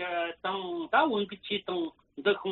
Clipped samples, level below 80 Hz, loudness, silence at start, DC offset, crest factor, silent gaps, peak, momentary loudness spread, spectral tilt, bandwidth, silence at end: under 0.1%; -72 dBFS; -31 LUFS; 0 s; under 0.1%; 20 dB; none; -10 dBFS; 8 LU; -1.5 dB/octave; 4.3 kHz; 0 s